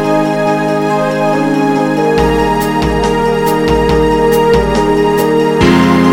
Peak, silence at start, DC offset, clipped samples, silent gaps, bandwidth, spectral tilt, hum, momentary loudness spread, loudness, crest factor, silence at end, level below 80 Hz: 0 dBFS; 0 s; 0.5%; under 0.1%; none; 17 kHz; -6 dB/octave; none; 4 LU; -11 LUFS; 10 dB; 0 s; -26 dBFS